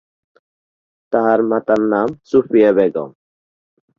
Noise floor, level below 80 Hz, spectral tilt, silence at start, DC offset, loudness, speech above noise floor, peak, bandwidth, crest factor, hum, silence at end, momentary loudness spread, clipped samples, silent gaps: under -90 dBFS; -58 dBFS; -8 dB/octave; 1.1 s; under 0.1%; -16 LUFS; over 75 dB; 0 dBFS; 7 kHz; 16 dB; none; 0.9 s; 8 LU; under 0.1%; none